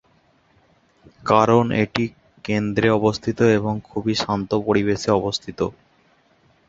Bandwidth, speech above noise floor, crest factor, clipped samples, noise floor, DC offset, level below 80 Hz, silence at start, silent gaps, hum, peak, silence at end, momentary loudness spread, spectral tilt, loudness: 7.8 kHz; 40 dB; 20 dB; under 0.1%; -59 dBFS; under 0.1%; -50 dBFS; 1.25 s; none; none; -2 dBFS; 0.95 s; 10 LU; -6 dB/octave; -20 LUFS